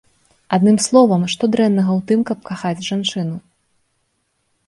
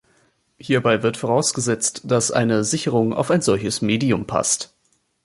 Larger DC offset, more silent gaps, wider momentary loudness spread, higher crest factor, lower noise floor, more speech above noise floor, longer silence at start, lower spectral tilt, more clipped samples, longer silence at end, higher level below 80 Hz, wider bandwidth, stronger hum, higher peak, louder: neither; neither; first, 11 LU vs 3 LU; about the same, 18 dB vs 18 dB; about the same, -68 dBFS vs -66 dBFS; first, 52 dB vs 46 dB; second, 0.5 s vs 0.65 s; first, -5.5 dB/octave vs -4 dB/octave; neither; first, 1.3 s vs 0.6 s; second, -60 dBFS vs -54 dBFS; about the same, 11.5 kHz vs 11.5 kHz; neither; first, 0 dBFS vs -4 dBFS; first, -17 LUFS vs -20 LUFS